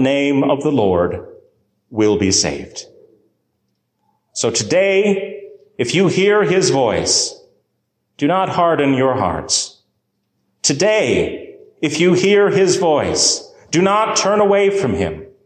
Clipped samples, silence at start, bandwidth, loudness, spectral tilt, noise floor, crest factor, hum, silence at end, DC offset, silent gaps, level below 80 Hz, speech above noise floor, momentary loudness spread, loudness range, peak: under 0.1%; 0 s; 10 kHz; -15 LUFS; -3.5 dB/octave; -70 dBFS; 14 dB; none; 0.2 s; under 0.1%; none; -44 dBFS; 55 dB; 10 LU; 5 LU; -2 dBFS